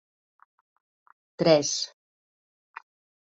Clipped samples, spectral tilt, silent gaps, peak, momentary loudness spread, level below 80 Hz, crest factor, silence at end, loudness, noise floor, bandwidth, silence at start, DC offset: under 0.1%; -3.5 dB/octave; none; -6 dBFS; 26 LU; -72 dBFS; 24 dB; 1.4 s; -24 LUFS; under -90 dBFS; 8 kHz; 1.4 s; under 0.1%